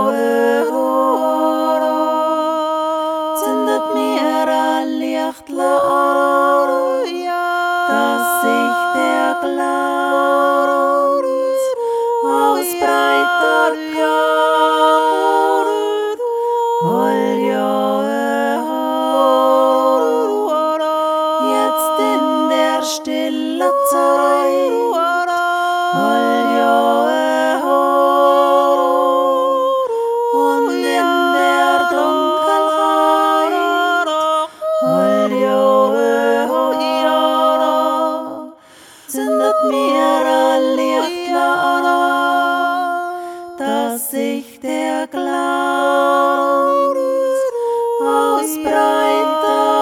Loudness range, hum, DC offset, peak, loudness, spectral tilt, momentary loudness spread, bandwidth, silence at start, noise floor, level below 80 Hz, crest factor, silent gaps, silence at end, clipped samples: 3 LU; none; under 0.1%; 0 dBFS; -15 LUFS; -3.5 dB/octave; 6 LU; 17.5 kHz; 0 s; -43 dBFS; -68 dBFS; 14 dB; none; 0 s; under 0.1%